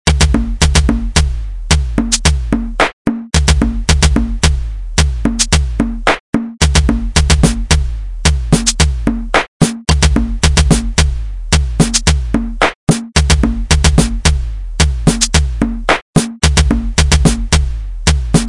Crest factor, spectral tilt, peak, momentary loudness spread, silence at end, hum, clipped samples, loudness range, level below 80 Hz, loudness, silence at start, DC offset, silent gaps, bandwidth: 12 dB; -4 dB/octave; 0 dBFS; 6 LU; 0 s; none; under 0.1%; 1 LU; -16 dBFS; -13 LUFS; 0.05 s; 0.6%; 2.93-3.05 s, 6.20-6.33 s, 9.48-9.60 s, 12.75-12.87 s, 16.02-16.13 s; 11.5 kHz